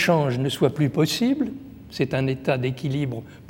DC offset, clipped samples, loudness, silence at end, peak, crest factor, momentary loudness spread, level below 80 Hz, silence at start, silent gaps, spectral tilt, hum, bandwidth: under 0.1%; under 0.1%; -24 LUFS; 0.05 s; -6 dBFS; 18 dB; 8 LU; -56 dBFS; 0 s; none; -6 dB/octave; none; 17 kHz